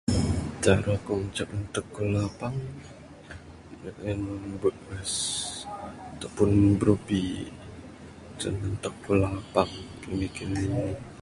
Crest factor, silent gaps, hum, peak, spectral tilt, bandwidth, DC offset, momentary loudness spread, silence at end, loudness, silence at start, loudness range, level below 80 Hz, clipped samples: 22 dB; none; none; -6 dBFS; -5.5 dB/octave; 11.5 kHz; under 0.1%; 21 LU; 0 s; -28 LUFS; 0.05 s; 6 LU; -44 dBFS; under 0.1%